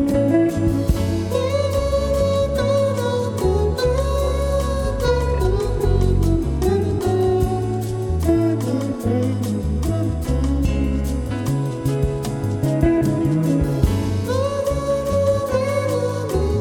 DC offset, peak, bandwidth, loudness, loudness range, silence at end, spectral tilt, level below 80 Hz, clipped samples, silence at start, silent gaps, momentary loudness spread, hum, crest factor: under 0.1%; -2 dBFS; 18 kHz; -20 LUFS; 2 LU; 0 s; -7 dB/octave; -26 dBFS; under 0.1%; 0 s; none; 4 LU; none; 16 dB